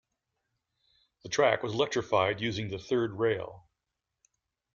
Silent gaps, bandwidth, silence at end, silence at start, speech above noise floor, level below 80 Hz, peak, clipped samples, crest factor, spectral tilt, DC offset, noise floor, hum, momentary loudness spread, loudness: none; 7.4 kHz; 1.15 s; 1.25 s; 57 dB; -66 dBFS; -12 dBFS; under 0.1%; 20 dB; -4.5 dB/octave; under 0.1%; -86 dBFS; none; 8 LU; -29 LUFS